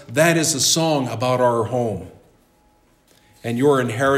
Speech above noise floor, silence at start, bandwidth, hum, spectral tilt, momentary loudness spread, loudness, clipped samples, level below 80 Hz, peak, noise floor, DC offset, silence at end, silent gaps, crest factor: 39 dB; 0 s; 16 kHz; none; -4 dB/octave; 11 LU; -18 LUFS; under 0.1%; -60 dBFS; -4 dBFS; -58 dBFS; under 0.1%; 0 s; none; 18 dB